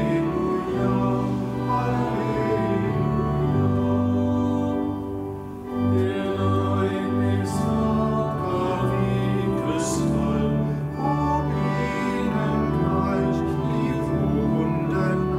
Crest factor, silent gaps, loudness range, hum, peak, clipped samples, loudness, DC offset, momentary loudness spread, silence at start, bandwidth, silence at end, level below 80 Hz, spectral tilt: 12 dB; none; 1 LU; none; -10 dBFS; under 0.1%; -23 LUFS; under 0.1%; 3 LU; 0 s; 14.5 kHz; 0 s; -40 dBFS; -7.5 dB/octave